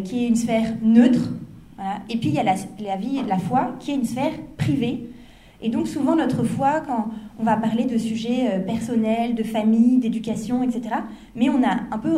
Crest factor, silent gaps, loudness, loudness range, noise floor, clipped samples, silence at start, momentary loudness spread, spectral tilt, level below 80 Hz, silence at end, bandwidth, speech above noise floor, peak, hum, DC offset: 18 dB; none; -22 LUFS; 3 LU; -46 dBFS; under 0.1%; 0 s; 11 LU; -6.5 dB/octave; -52 dBFS; 0 s; 12.5 kHz; 24 dB; -4 dBFS; none; under 0.1%